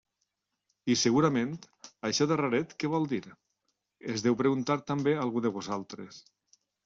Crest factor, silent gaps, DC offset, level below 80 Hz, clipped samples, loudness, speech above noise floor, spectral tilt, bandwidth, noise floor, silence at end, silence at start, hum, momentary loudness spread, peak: 18 dB; none; under 0.1%; -70 dBFS; under 0.1%; -29 LUFS; 53 dB; -5 dB/octave; 7.8 kHz; -82 dBFS; 0.65 s; 0.85 s; none; 13 LU; -12 dBFS